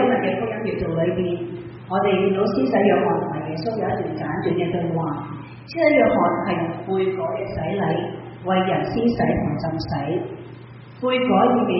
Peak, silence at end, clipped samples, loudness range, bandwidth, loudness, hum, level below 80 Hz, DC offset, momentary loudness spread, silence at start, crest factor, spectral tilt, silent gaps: -4 dBFS; 0 s; under 0.1%; 2 LU; 5.8 kHz; -22 LUFS; none; -48 dBFS; under 0.1%; 14 LU; 0 s; 16 dB; -5.5 dB/octave; none